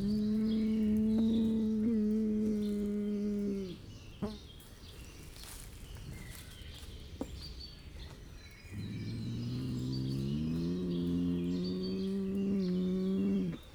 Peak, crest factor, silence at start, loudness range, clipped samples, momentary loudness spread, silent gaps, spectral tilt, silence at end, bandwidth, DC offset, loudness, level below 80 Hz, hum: -24 dBFS; 12 dB; 0 s; 15 LU; under 0.1%; 18 LU; none; -7.5 dB/octave; 0 s; 17.5 kHz; under 0.1%; -34 LUFS; -52 dBFS; none